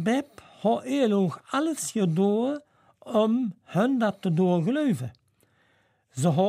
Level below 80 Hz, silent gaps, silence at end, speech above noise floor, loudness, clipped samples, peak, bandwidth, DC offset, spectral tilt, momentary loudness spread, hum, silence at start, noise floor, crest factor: -74 dBFS; none; 0 s; 42 dB; -26 LUFS; under 0.1%; -10 dBFS; 15 kHz; under 0.1%; -6.5 dB/octave; 7 LU; none; 0 s; -66 dBFS; 16 dB